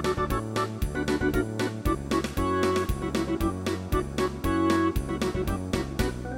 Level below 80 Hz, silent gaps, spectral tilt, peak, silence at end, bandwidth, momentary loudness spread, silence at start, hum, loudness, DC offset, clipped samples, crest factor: -36 dBFS; none; -6 dB/octave; -12 dBFS; 0 s; 17 kHz; 5 LU; 0 s; none; -28 LUFS; under 0.1%; under 0.1%; 16 dB